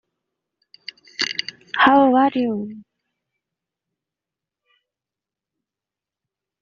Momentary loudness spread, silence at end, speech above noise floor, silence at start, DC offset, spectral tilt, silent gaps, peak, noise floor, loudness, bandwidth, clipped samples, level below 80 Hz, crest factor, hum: 24 LU; 3.8 s; 72 dB; 1.2 s; under 0.1%; -1.5 dB/octave; none; -2 dBFS; -88 dBFS; -18 LUFS; 7.4 kHz; under 0.1%; -66 dBFS; 22 dB; none